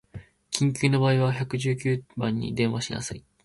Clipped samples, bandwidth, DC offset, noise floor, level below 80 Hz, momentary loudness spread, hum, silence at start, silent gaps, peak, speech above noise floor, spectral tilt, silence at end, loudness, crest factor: under 0.1%; 11.5 kHz; under 0.1%; -45 dBFS; -56 dBFS; 11 LU; none; 0.15 s; none; -6 dBFS; 20 dB; -5.5 dB/octave; 0.25 s; -26 LUFS; 20 dB